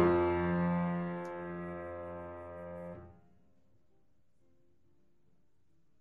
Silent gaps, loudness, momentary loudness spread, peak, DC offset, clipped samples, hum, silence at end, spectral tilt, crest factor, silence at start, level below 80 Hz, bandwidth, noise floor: none; -36 LUFS; 15 LU; -16 dBFS; under 0.1%; under 0.1%; none; 2.9 s; -10 dB/octave; 22 dB; 0 s; -62 dBFS; 4.4 kHz; -76 dBFS